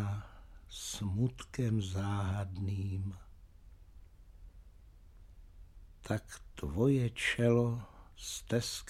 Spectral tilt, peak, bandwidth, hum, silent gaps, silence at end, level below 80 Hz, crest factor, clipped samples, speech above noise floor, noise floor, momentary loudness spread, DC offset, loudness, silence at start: -5.5 dB/octave; -16 dBFS; 14.5 kHz; none; none; 0 s; -54 dBFS; 20 dB; under 0.1%; 23 dB; -57 dBFS; 17 LU; under 0.1%; -35 LUFS; 0 s